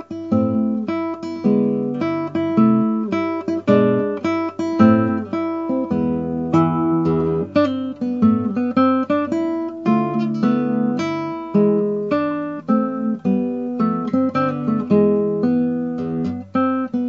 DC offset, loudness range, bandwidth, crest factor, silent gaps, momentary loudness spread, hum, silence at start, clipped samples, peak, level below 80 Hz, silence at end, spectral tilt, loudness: under 0.1%; 2 LU; 7 kHz; 18 dB; none; 7 LU; none; 0 s; under 0.1%; -2 dBFS; -54 dBFS; 0 s; -9 dB/octave; -19 LUFS